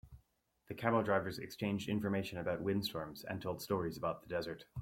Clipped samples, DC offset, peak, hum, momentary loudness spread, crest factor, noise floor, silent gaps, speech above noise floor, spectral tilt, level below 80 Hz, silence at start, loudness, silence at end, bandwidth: under 0.1%; under 0.1%; -16 dBFS; none; 10 LU; 22 dB; -76 dBFS; none; 38 dB; -6 dB/octave; -66 dBFS; 0.05 s; -38 LUFS; 0 s; 16.5 kHz